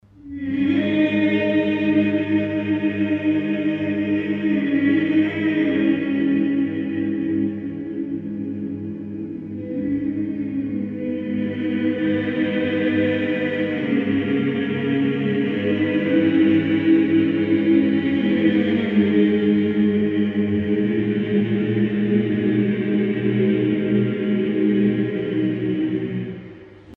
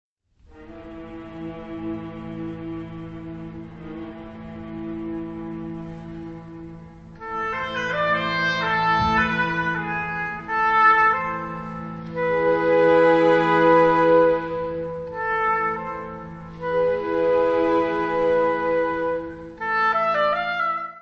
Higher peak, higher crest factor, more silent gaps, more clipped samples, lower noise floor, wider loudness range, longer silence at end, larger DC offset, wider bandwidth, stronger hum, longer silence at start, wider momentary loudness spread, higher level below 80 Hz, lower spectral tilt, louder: about the same, -6 dBFS vs -6 dBFS; about the same, 14 dB vs 18 dB; neither; neither; second, -41 dBFS vs -53 dBFS; second, 7 LU vs 16 LU; about the same, 0 s vs 0 s; neither; second, 4.3 kHz vs 6.8 kHz; neither; second, 0.25 s vs 0.55 s; second, 9 LU vs 21 LU; second, -58 dBFS vs -48 dBFS; first, -9.5 dB/octave vs -6.5 dB/octave; about the same, -21 LUFS vs -21 LUFS